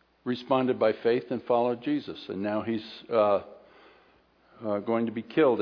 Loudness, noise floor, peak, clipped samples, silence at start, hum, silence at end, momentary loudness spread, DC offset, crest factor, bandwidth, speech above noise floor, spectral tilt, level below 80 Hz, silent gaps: -28 LUFS; -62 dBFS; -10 dBFS; under 0.1%; 0.25 s; none; 0 s; 10 LU; under 0.1%; 18 dB; 5.4 kHz; 35 dB; -8.5 dB/octave; -74 dBFS; none